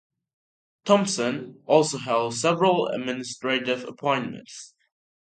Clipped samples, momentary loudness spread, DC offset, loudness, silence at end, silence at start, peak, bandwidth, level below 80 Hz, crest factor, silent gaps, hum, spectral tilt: under 0.1%; 14 LU; under 0.1%; -24 LUFS; 0.6 s; 0.85 s; -4 dBFS; 9.4 kHz; -72 dBFS; 22 dB; none; none; -4 dB/octave